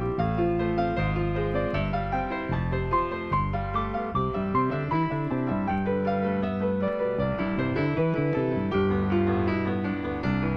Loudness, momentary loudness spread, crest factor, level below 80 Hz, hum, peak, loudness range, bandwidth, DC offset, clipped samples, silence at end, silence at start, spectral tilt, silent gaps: -27 LUFS; 4 LU; 14 dB; -40 dBFS; none; -12 dBFS; 2 LU; 6 kHz; under 0.1%; under 0.1%; 0 s; 0 s; -9.5 dB/octave; none